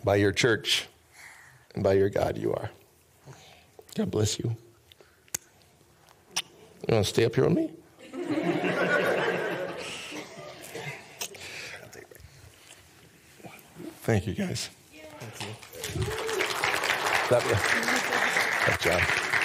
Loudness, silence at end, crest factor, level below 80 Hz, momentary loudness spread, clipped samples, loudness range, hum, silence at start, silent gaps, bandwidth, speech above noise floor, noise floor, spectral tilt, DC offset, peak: -27 LUFS; 0 s; 20 dB; -58 dBFS; 19 LU; under 0.1%; 12 LU; none; 0 s; none; 16 kHz; 34 dB; -59 dBFS; -4 dB/octave; under 0.1%; -8 dBFS